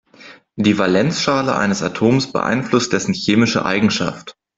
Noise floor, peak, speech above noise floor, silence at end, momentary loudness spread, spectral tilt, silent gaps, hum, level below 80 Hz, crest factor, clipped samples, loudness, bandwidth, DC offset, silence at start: -43 dBFS; -2 dBFS; 27 dB; 0.25 s; 4 LU; -5 dB/octave; none; none; -52 dBFS; 16 dB; under 0.1%; -17 LUFS; 8 kHz; under 0.1%; 0.2 s